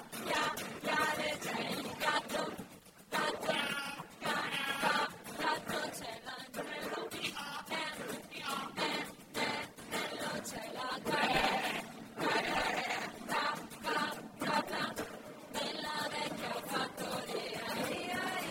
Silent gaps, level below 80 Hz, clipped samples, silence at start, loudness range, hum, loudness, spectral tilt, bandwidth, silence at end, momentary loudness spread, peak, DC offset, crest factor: none; -68 dBFS; under 0.1%; 0 s; 4 LU; none; -37 LUFS; -3 dB/octave; 16.5 kHz; 0 s; 9 LU; -18 dBFS; under 0.1%; 20 dB